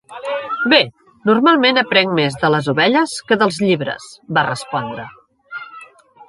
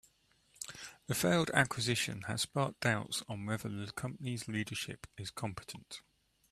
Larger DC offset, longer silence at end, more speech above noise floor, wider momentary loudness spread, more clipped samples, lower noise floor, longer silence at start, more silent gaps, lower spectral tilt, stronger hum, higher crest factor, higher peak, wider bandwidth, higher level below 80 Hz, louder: neither; second, 0.05 s vs 0.5 s; second, 27 dB vs 35 dB; first, 19 LU vs 16 LU; neither; second, -42 dBFS vs -71 dBFS; second, 0.1 s vs 0.6 s; neither; about the same, -5 dB/octave vs -4 dB/octave; neither; second, 18 dB vs 26 dB; first, 0 dBFS vs -12 dBFS; second, 11.5 kHz vs 14 kHz; first, -60 dBFS vs -66 dBFS; first, -16 LUFS vs -36 LUFS